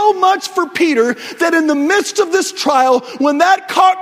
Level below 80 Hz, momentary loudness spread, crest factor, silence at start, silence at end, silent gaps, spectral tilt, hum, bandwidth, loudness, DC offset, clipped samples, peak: -62 dBFS; 5 LU; 14 dB; 0 s; 0 s; none; -2 dB/octave; none; 16 kHz; -13 LUFS; under 0.1%; under 0.1%; 0 dBFS